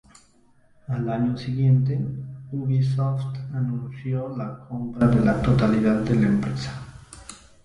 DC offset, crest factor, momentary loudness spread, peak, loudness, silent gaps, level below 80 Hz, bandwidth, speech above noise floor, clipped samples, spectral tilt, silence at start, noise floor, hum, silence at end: under 0.1%; 18 dB; 15 LU; -6 dBFS; -24 LUFS; none; -46 dBFS; 11 kHz; 35 dB; under 0.1%; -8.5 dB/octave; 0.9 s; -57 dBFS; none; 0.25 s